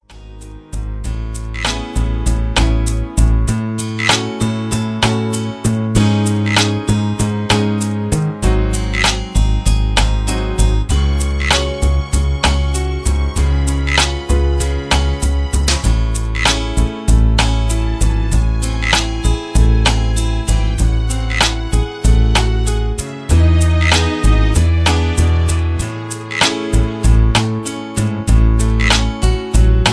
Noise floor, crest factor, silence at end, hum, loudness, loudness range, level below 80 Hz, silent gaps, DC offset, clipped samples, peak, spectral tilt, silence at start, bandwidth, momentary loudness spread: -34 dBFS; 14 dB; 0 s; none; -16 LUFS; 2 LU; -16 dBFS; none; under 0.1%; under 0.1%; 0 dBFS; -4.5 dB/octave; 0.1 s; 11 kHz; 6 LU